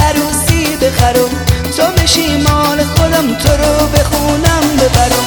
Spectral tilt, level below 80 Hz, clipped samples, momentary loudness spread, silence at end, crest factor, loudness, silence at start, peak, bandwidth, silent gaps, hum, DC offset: -4.5 dB/octave; -20 dBFS; under 0.1%; 3 LU; 0 s; 10 dB; -11 LUFS; 0 s; 0 dBFS; over 20 kHz; none; none; under 0.1%